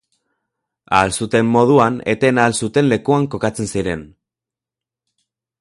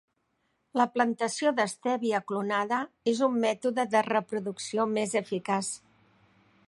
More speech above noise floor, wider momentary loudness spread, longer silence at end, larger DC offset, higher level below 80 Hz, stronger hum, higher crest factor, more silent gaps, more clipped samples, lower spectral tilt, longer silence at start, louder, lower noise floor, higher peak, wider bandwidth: first, 72 dB vs 47 dB; first, 9 LU vs 6 LU; first, 1.55 s vs 0.9 s; neither; first, -46 dBFS vs -80 dBFS; neither; about the same, 18 dB vs 20 dB; neither; neither; first, -5.5 dB/octave vs -4 dB/octave; first, 0.9 s vs 0.75 s; first, -16 LUFS vs -29 LUFS; first, -87 dBFS vs -75 dBFS; first, 0 dBFS vs -10 dBFS; about the same, 11.5 kHz vs 11.5 kHz